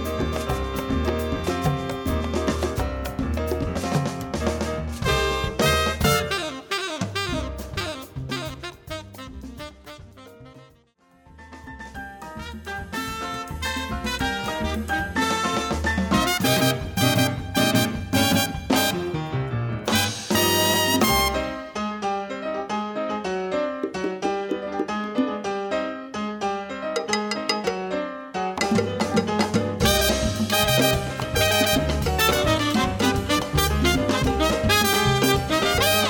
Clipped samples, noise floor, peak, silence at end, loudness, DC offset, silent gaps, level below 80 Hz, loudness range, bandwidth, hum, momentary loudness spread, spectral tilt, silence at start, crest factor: under 0.1%; -58 dBFS; -4 dBFS; 0 s; -23 LUFS; under 0.1%; none; -36 dBFS; 13 LU; over 20 kHz; none; 11 LU; -4 dB/octave; 0 s; 20 dB